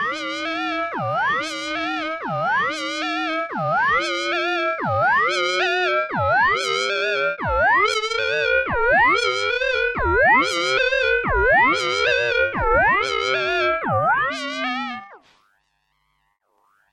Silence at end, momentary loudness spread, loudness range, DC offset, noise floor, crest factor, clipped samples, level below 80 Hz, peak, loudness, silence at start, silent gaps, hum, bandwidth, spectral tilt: 1.75 s; 8 LU; 5 LU; under 0.1%; -69 dBFS; 16 dB; under 0.1%; -40 dBFS; -6 dBFS; -19 LUFS; 0 s; none; none; 12.5 kHz; -3.5 dB/octave